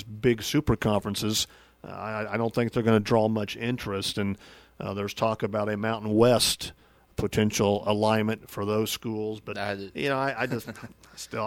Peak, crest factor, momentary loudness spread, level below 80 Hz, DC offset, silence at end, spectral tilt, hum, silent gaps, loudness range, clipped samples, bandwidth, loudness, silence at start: -6 dBFS; 20 dB; 13 LU; -50 dBFS; under 0.1%; 0 s; -5 dB/octave; none; none; 3 LU; under 0.1%; 17 kHz; -27 LUFS; 0 s